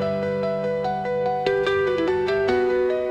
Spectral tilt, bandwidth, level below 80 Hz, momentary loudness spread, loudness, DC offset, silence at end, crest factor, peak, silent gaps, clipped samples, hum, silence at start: -6.5 dB/octave; 8 kHz; -52 dBFS; 4 LU; -23 LUFS; under 0.1%; 0 s; 12 dB; -10 dBFS; none; under 0.1%; none; 0 s